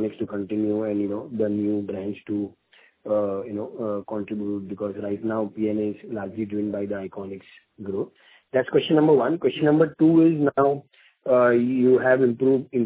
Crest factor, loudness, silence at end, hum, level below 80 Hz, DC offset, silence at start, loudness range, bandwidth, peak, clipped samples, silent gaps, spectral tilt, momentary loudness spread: 18 dB; -23 LUFS; 0 s; none; -62 dBFS; under 0.1%; 0 s; 9 LU; 4 kHz; -6 dBFS; under 0.1%; none; -11 dB/octave; 14 LU